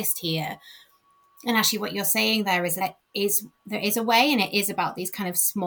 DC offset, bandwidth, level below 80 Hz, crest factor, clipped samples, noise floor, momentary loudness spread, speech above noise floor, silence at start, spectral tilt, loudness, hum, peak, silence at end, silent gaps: under 0.1%; over 20 kHz; -70 dBFS; 18 dB; under 0.1%; -61 dBFS; 10 LU; 37 dB; 0 s; -2.5 dB/octave; -23 LUFS; none; -6 dBFS; 0 s; none